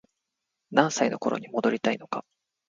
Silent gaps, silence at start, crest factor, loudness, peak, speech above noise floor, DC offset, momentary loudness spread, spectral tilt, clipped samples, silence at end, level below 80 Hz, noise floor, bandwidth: none; 0.7 s; 24 dB; -27 LUFS; -4 dBFS; 57 dB; under 0.1%; 10 LU; -4.5 dB/octave; under 0.1%; 0.45 s; -74 dBFS; -83 dBFS; 9.4 kHz